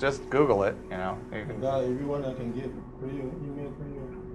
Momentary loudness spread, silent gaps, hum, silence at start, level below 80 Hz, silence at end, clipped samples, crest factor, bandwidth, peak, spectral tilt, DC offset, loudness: 15 LU; none; none; 0 s; -48 dBFS; 0 s; under 0.1%; 20 dB; 11 kHz; -10 dBFS; -7 dB/octave; under 0.1%; -31 LUFS